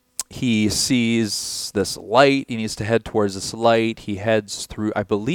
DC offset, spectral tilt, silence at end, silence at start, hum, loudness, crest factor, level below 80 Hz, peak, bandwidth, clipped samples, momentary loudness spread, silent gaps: under 0.1%; -4 dB/octave; 0 s; 0.2 s; none; -21 LUFS; 20 dB; -48 dBFS; 0 dBFS; 18.5 kHz; under 0.1%; 9 LU; none